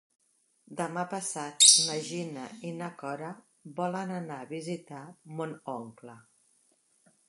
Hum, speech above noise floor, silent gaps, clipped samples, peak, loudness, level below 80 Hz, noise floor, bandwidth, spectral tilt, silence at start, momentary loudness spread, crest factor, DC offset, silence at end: none; 38 dB; none; under 0.1%; -6 dBFS; -27 LUFS; -84 dBFS; -69 dBFS; 12 kHz; -1.5 dB/octave; 0.7 s; 25 LU; 26 dB; under 0.1%; 1.1 s